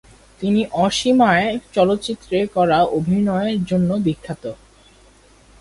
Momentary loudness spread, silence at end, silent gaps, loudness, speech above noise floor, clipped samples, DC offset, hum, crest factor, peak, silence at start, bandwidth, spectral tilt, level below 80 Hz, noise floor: 11 LU; 1.05 s; none; -18 LUFS; 32 dB; under 0.1%; under 0.1%; none; 16 dB; -4 dBFS; 0.4 s; 11.5 kHz; -6 dB/octave; -48 dBFS; -50 dBFS